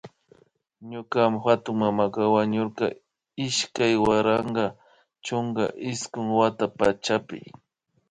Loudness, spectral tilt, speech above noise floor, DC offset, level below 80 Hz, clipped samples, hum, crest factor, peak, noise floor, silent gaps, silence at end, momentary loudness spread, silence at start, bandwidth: -24 LUFS; -5 dB/octave; 36 dB; under 0.1%; -58 dBFS; under 0.1%; none; 18 dB; -6 dBFS; -60 dBFS; none; 0.6 s; 11 LU; 0.05 s; 10 kHz